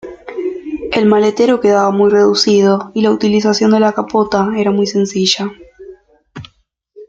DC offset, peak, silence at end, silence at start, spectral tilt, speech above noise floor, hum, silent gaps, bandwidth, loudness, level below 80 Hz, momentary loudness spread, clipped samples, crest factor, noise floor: under 0.1%; 0 dBFS; 0.05 s; 0.05 s; -5 dB/octave; 43 dB; none; none; 7.8 kHz; -13 LUFS; -50 dBFS; 12 LU; under 0.1%; 12 dB; -55 dBFS